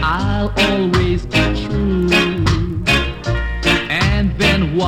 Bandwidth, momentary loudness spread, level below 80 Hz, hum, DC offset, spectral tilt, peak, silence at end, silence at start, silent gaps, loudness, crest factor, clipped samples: 16.5 kHz; 4 LU; -24 dBFS; none; under 0.1%; -5.5 dB/octave; -2 dBFS; 0 s; 0 s; none; -16 LUFS; 14 dB; under 0.1%